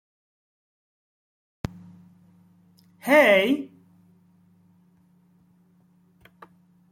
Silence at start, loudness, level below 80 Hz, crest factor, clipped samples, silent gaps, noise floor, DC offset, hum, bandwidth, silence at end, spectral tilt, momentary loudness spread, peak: 3.05 s; -19 LUFS; -60 dBFS; 24 dB; under 0.1%; none; -60 dBFS; under 0.1%; none; 16 kHz; 3.25 s; -5 dB/octave; 22 LU; -6 dBFS